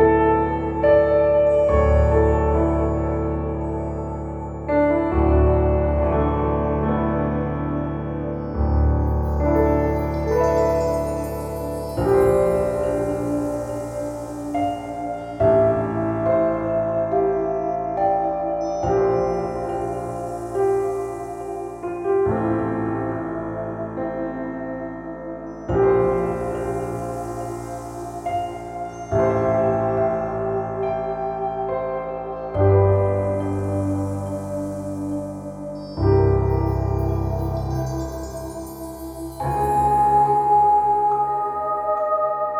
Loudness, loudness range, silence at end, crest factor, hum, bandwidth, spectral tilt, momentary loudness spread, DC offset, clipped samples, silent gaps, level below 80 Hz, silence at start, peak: -22 LUFS; 5 LU; 0 s; 16 dB; none; 15.5 kHz; -8.5 dB/octave; 13 LU; under 0.1%; under 0.1%; none; -30 dBFS; 0 s; -4 dBFS